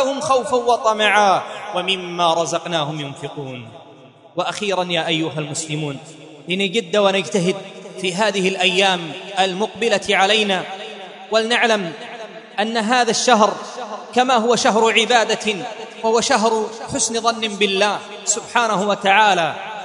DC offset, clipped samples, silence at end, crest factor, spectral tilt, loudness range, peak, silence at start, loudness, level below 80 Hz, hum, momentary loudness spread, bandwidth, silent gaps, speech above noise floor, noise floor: under 0.1%; under 0.1%; 0 s; 18 dB; -3 dB/octave; 6 LU; 0 dBFS; 0 s; -18 LUFS; -64 dBFS; none; 15 LU; 11 kHz; none; 26 dB; -44 dBFS